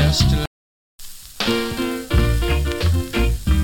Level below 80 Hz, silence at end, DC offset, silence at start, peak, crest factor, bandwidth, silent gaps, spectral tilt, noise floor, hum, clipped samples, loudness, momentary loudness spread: -22 dBFS; 0 s; under 0.1%; 0 s; -4 dBFS; 16 dB; 17.5 kHz; 0.47-0.98 s; -5.5 dB/octave; under -90 dBFS; none; under 0.1%; -20 LUFS; 13 LU